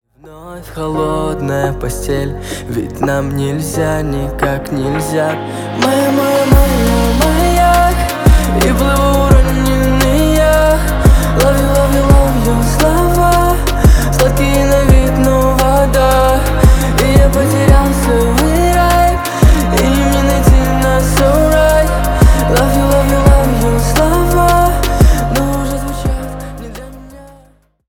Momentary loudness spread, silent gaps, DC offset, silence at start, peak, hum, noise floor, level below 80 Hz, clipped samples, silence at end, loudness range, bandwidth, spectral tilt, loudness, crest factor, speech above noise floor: 8 LU; none; under 0.1%; 0.25 s; 0 dBFS; none; -47 dBFS; -14 dBFS; under 0.1%; 0.65 s; 6 LU; 19 kHz; -5.5 dB/octave; -12 LUFS; 10 dB; 34 dB